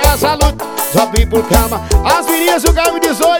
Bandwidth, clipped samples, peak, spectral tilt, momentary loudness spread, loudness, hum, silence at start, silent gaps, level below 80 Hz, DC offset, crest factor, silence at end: 19.5 kHz; 0.4%; 0 dBFS; -4 dB/octave; 3 LU; -12 LUFS; none; 0 s; none; -16 dBFS; under 0.1%; 12 dB; 0 s